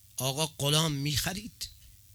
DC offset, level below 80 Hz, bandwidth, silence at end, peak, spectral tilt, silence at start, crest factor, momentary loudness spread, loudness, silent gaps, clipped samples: under 0.1%; -52 dBFS; over 20 kHz; 0.25 s; -10 dBFS; -3.5 dB/octave; 0.15 s; 22 dB; 15 LU; -29 LUFS; none; under 0.1%